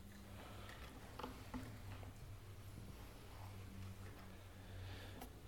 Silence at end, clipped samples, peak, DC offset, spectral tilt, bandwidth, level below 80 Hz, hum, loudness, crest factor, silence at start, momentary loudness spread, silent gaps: 0 s; under 0.1%; -34 dBFS; under 0.1%; -5.5 dB/octave; 18 kHz; -60 dBFS; none; -55 LUFS; 20 dB; 0 s; 5 LU; none